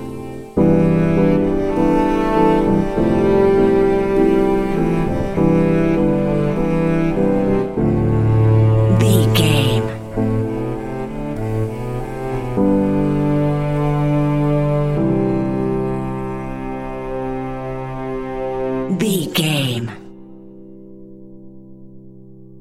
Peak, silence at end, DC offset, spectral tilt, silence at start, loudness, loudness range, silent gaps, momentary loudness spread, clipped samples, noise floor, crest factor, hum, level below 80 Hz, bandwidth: 0 dBFS; 0.05 s; 0.7%; -7 dB/octave; 0 s; -17 LUFS; 8 LU; none; 12 LU; under 0.1%; -41 dBFS; 16 dB; none; -32 dBFS; 15.5 kHz